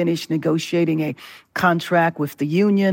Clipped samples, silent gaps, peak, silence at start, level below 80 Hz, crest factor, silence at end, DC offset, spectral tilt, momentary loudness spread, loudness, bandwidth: under 0.1%; none; -4 dBFS; 0 s; -64 dBFS; 16 dB; 0 s; under 0.1%; -6.5 dB/octave; 9 LU; -20 LUFS; 17 kHz